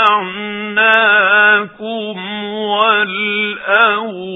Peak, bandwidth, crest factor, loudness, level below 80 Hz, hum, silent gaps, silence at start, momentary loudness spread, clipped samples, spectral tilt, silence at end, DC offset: 0 dBFS; 4 kHz; 14 dB; -13 LUFS; -64 dBFS; none; none; 0 s; 13 LU; under 0.1%; -5.5 dB/octave; 0 s; under 0.1%